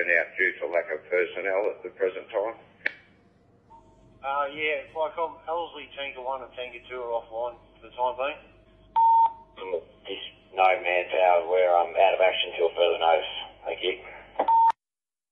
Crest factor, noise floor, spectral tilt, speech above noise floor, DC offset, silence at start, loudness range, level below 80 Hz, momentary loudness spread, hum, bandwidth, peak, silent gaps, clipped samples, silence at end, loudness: 20 dB; under -90 dBFS; -4.5 dB/octave; over 63 dB; under 0.1%; 0 s; 9 LU; -64 dBFS; 16 LU; none; 5.6 kHz; -8 dBFS; none; under 0.1%; 0.6 s; -26 LUFS